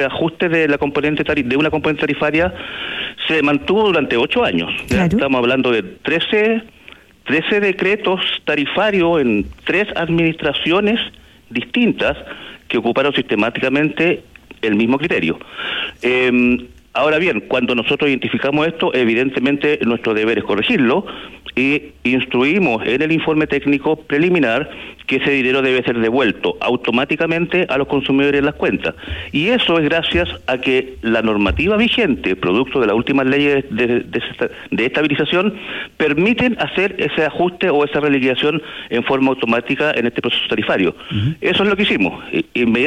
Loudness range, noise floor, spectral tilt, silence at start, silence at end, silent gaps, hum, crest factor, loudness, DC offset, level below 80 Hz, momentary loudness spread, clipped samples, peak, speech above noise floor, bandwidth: 2 LU; -43 dBFS; -6.5 dB/octave; 0 s; 0 s; none; none; 12 dB; -16 LUFS; under 0.1%; -42 dBFS; 7 LU; under 0.1%; -4 dBFS; 27 dB; 11.5 kHz